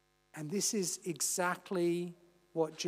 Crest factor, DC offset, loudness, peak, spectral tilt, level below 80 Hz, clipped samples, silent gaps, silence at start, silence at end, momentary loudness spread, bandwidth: 16 dB; under 0.1%; -35 LUFS; -20 dBFS; -3.5 dB/octave; -84 dBFS; under 0.1%; none; 0.35 s; 0 s; 12 LU; 16 kHz